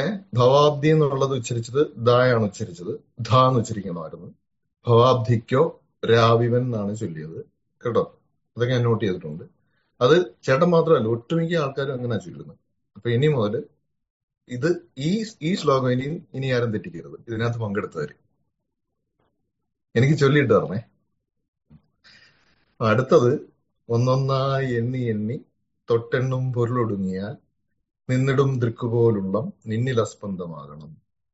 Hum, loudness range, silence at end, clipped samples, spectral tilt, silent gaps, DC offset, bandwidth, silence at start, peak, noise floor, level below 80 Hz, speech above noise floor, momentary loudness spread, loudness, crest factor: none; 5 LU; 0.4 s; under 0.1%; -6 dB/octave; 14.10-14.28 s, 21.48-21.53 s; under 0.1%; 8 kHz; 0 s; -4 dBFS; -75 dBFS; -60 dBFS; 53 dB; 16 LU; -22 LUFS; 18 dB